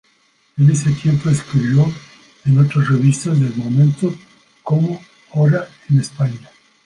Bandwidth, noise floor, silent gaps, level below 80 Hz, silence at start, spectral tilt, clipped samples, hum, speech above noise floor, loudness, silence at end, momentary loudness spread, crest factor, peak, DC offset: 11 kHz; -58 dBFS; none; -52 dBFS; 0.55 s; -7.5 dB/octave; under 0.1%; none; 43 dB; -16 LUFS; 0.45 s; 12 LU; 14 dB; -2 dBFS; under 0.1%